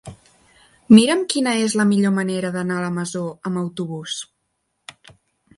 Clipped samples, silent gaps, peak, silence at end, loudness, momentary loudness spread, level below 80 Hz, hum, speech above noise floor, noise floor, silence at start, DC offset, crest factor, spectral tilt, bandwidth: under 0.1%; none; 0 dBFS; 1.35 s; -19 LUFS; 16 LU; -60 dBFS; none; 54 dB; -73 dBFS; 0.05 s; under 0.1%; 20 dB; -5 dB/octave; 11.5 kHz